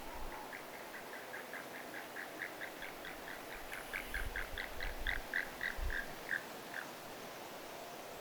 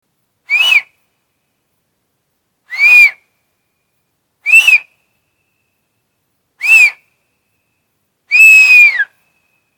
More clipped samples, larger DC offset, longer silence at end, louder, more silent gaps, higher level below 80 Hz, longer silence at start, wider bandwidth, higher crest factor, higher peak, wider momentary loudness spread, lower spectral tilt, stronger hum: second, under 0.1% vs 1%; neither; second, 0 s vs 0.75 s; second, -44 LUFS vs -6 LUFS; neither; first, -50 dBFS vs -64 dBFS; second, 0 s vs 0.5 s; about the same, over 20 kHz vs over 20 kHz; first, 24 dB vs 12 dB; second, -20 dBFS vs 0 dBFS; second, 8 LU vs 15 LU; first, -3 dB/octave vs 4 dB/octave; neither